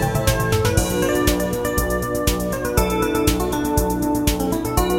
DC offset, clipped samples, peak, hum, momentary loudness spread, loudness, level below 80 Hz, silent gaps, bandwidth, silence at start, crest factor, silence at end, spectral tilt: 0.2%; under 0.1%; -2 dBFS; none; 3 LU; -20 LUFS; -28 dBFS; none; 17 kHz; 0 s; 18 dB; 0 s; -5 dB/octave